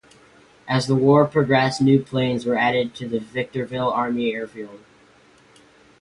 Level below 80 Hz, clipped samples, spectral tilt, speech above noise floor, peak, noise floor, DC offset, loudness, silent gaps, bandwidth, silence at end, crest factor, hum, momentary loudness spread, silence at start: -58 dBFS; under 0.1%; -6.5 dB/octave; 33 dB; -4 dBFS; -53 dBFS; under 0.1%; -20 LUFS; none; 11.5 kHz; 1.25 s; 18 dB; none; 12 LU; 0.65 s